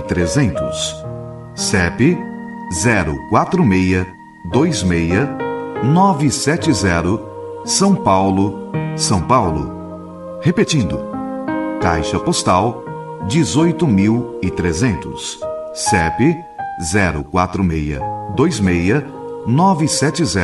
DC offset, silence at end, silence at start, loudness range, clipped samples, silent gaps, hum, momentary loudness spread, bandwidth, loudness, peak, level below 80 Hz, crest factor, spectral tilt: under 0.1%; 0 s; 0 s; 2 LU; under 0.1%; none; none; 12 LU; 12 kHz; -17 LUFS; -2 dBFS; -36 dBFS; 14 dB; -5 dB/octave